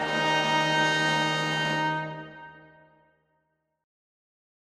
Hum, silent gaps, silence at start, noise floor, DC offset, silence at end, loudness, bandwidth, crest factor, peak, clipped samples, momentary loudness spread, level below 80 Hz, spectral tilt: none; none; 0 s; -75 dBFS; under 0.1%; 2.15 s; -25 LUFS; 15.5 kHz; 16 dB; -12 dBFS; under 0.1%; 17 LU; -66 dBFS; -3.5 dB/octave